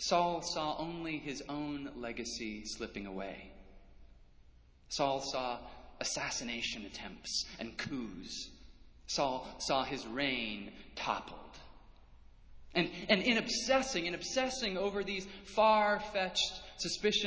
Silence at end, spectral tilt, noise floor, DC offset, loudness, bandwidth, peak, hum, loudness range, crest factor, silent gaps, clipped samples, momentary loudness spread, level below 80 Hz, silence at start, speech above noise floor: 0 s; -3 dB/octave; -61 dBFS; under 0.1%; -35 LUFS; 8 kHz; -12 dBFS; none; 9 LU; 24 dB; none; under 0.1%; 14 LU; -60 dBFS; 0 s; 25 dB